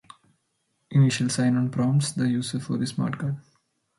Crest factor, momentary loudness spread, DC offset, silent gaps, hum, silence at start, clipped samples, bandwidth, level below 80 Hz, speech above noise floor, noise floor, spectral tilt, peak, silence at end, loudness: 16 dB; 8 LU; under 0.1%; none; none; 0.9 s; under 0.1%; 11.5 kHz; -66 dBFS; 50 dB; -74 dBFS; -6 dB/octave; -10 dBFS; 0.6 s; -25 LUFS